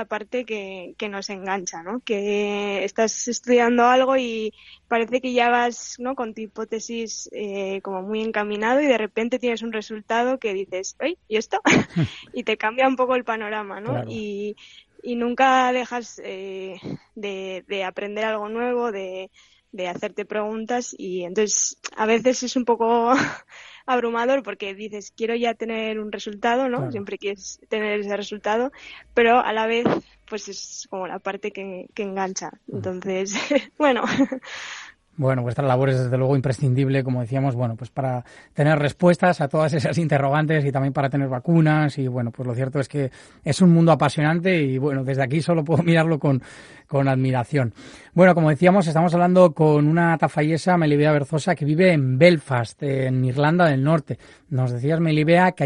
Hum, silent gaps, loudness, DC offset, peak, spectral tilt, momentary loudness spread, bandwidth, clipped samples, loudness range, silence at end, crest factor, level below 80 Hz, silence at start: none; none; -22 LUFS; under 0.1%; -2 dBFS; -6 dB/octave; 14 LU; 10.5 kHz; under 0.1%; 8 LU; 0 s; 20 dB; -60 dBFS; 0 s